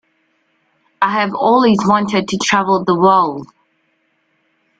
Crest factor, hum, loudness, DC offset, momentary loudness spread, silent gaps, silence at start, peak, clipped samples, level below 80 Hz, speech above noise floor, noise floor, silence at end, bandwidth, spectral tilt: 16 dB; none; -14 LUFS; under 0.1%; 7 LU; none; 1 s; 0 dBFS; under 0.1%; -56 dBFS; 49 dB; -63 dBFS; 1.35 s; 9.2 kHz; -5 dB/octave